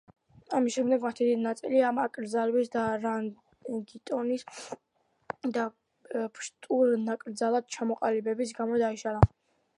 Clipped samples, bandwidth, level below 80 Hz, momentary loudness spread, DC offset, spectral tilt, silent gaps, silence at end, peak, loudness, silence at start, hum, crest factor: under 0.1%; 11 kHz; -50 dBFS; 12 LU; under 0.1%; -6.5 dB/octave; none; 0.5 s; -2 dBFS; -30 LUFS; 0.5 s; none; 28 dB